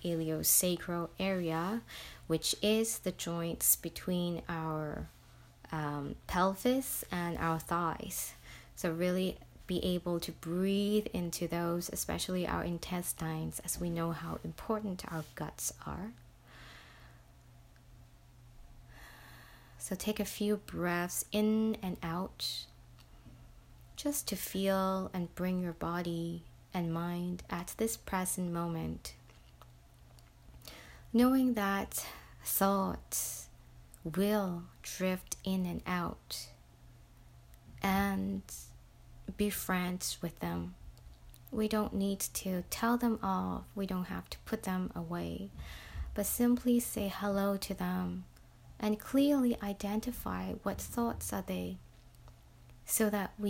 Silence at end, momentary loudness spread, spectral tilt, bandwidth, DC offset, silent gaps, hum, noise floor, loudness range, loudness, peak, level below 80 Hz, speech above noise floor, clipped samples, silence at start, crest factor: 0 s; 15 LU; -4.5 dB/octave; 16.5 kHz; under 0.1%; none; none; -59 dBFS; 6 LU; -35 LUFS; -14 dBFS; -54 dBFS; 24 dB; under 0.1%; 0 s; 22 dB